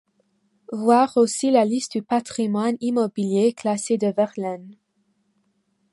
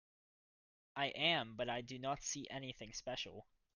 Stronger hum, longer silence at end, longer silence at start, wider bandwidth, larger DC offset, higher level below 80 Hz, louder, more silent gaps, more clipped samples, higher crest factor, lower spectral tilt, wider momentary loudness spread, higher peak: neither; first, 1.2 s vs 0.3 s; second, 0.7 s vs 0.95 s; about the same, 11.5 kHz vs 10.5 kHz; neither; about the same, -72 dBFS vs -70 dBFS; first, -21 LUFS vs -41 LUFS; neither; neither; second, 18 dB vs 24 dB; first, -5 dB/octave vs -2.5 dB/octave; second, 8 LU vs 13 LU; first, -4 dBFS vs -20 dBFS